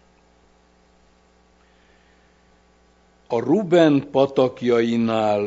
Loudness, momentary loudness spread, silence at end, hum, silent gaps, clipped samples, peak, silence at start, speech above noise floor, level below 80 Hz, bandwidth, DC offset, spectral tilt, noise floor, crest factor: -19 LUFS; 5 LU; 0 s; 60 Hz at -55 dBFS; none; under 0.1%; -2 dBFS; 3.3 s; 39 dB; -62 dBFS; 7.8 kHz; under 0.1%; -7 dB/octave; -57 dBFS; 22 dB